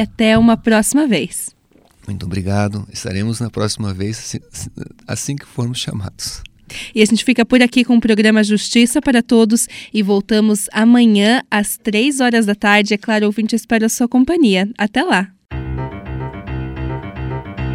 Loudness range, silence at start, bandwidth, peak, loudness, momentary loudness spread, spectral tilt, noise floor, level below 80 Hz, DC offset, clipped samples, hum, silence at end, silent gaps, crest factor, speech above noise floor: 9 LU; 0 s; 15.5 kHz; 0 dBFS; -15 LUFS; 15 LU; -4.5 dB/octave; -51 dBFS; -38 dBFS; under 0.1%; under 0.1%; none; 0 s; none; 16 dB; 36 dB